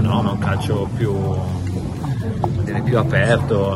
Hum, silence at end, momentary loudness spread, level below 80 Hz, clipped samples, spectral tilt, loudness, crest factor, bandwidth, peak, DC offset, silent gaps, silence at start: none; 0 s; 8 LU; -38 dBFS; under 0.1%; -7.5 dB/octave; -20 LUFS; 16 dB; 12 kHz; -2 dBFS; under 0.1%; none; 0 s